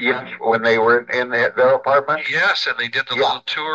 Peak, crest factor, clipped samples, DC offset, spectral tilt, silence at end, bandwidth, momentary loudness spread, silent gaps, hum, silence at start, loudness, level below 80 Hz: -4 dBFS; 14 dB; under 0.1%; under 0.1%; -4 dB/octave; 0 s; 7.8 kHz; 5 LU; none; none; 0 s; -17 LUFS; -66 dBFS